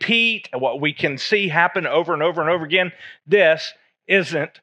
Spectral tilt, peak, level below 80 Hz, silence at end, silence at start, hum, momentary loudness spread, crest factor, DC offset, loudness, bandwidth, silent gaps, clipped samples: -5 dB/octave; -2 dBFS; -76 dBFS; 0.15 s; 0 s; none; 7 LU; 18 dB; under 0.1%; -19 LUFS; 9.8 kHz; none; under 0.1%